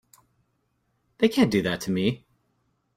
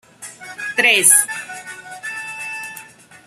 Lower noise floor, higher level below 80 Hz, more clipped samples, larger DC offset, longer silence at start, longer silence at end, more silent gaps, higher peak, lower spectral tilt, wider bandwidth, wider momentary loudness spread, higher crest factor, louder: first, -73 dBFS vs -41 dBFS; first, -60 dBFS vs -72 dBFS; neither; neither; first, 1.2 s vs 0.2 s; first, 0.8 s vs 0.1 s; neither; second, -8 dBFS vs 0 dBFS; first, -6 dB/octave vs 1 dB/octave; about the same, 16 kHz vs 15.5 kHz; second, 7 LU vs 23 LU; about the same, 20 dB vs 20 dB; second, -24 LUFS vs -14 LUFS